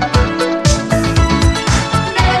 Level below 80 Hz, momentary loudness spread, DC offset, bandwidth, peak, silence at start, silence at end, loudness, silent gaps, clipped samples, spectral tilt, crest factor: -20 dBFS; 2 LU; under 0.1%; 13 kHz; 0 dBFS; 0 s; 0 s; -14 LUFS; none; under 0.1%; -5 dB/octave; 12 dB